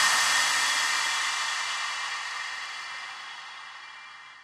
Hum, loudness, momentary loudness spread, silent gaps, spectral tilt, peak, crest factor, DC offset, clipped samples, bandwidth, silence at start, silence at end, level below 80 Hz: none; -26 LUFS; 20 LU; none; 3 dB/octave; -10 dBFS; 18 dB; under 0.1%; under 0.1%; 15.5 kHz; 0 s; 0 s; -76 dBFS